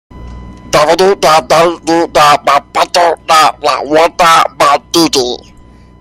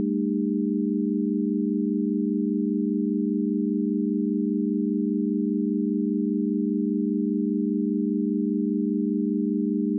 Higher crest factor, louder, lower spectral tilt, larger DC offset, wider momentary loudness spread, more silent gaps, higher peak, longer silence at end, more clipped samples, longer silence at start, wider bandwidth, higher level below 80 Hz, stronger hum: about the same, 10 dB vs 8 dB; first, -9 LUFS vs -25 LUFS; second, -3 dB/octave vs -17.5 dB/octave; neither; first, 6 LU vs 0 LU; neither; first, 0 dBFS vs -16 dBFS; first, 0.65 s vs 0 s; first, 0.1% vs under 0.1%; first, 0.15 s vs 0 s; first, 17 kHz vs 0.5 kHz; first, -38 dBFS vs under -90 dBFS; neither